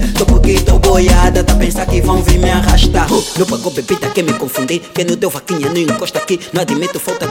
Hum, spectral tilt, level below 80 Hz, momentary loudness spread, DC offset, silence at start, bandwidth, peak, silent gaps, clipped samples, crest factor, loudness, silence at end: none; -5 dB/octave; -16 dBFS; 7 LU; under 0.1%; 0 s; 17 kHz; 0 dBFS; none; under 0.1%; 12 dB; -13 LUFS; 0 s